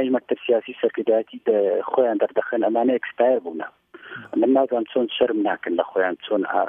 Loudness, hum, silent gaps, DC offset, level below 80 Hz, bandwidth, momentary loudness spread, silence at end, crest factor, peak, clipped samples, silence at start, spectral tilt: -22 LUFS; none; none; under 0.1%; -72 dBFS; 3.7 kHz; 5 LU; 0 s; 16 dB; -4 dBFS; under 0.1%; 0 s; -8 dB/octave